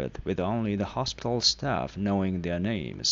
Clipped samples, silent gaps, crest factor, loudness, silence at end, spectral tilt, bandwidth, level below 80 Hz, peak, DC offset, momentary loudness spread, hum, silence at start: under 0.1%; none; 20 dB; -28 LUFS; 0 s; -4.5 dB/octave; 7.8 kHz; -48 dBFS; -8 dBFS; under 0.1%; 7 LU; none; 0 s